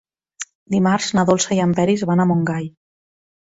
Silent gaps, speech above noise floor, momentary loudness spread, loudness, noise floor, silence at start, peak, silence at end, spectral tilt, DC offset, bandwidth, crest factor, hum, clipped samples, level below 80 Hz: 0.55-0.66 s; 20 dB; 17 LU; -18 LUFS; -37 dBFS; 0.4 s; -4 dBFS; 0.7 s; -5.5 dB/octave; under 0.1%; 8 kHz; 16 dB; none; under 0.1%; -54 dBFS